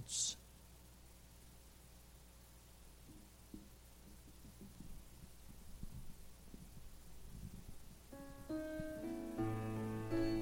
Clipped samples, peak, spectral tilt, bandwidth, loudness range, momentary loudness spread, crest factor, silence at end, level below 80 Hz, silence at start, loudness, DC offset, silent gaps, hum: under 0.1%; -26 dBFS; -4 dB/octave; 16.5 kHz; 14 LU; 20 LU; 22 dB; 0 s; -58 dBFS; 0 s; -47 LUFS; under 0.1%; none; none